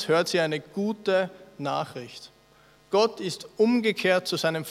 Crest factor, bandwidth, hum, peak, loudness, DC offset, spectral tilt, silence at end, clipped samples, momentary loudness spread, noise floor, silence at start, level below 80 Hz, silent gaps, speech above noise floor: 18 dB; 16 kHz; none; -8 dBFS; -26 LUFS; under 0.1%; -4.5 dB/octave; 0 s; under 0.1%; 12 LU; -57 dBFS; 0 s; -70 dBFS; none; 32 dB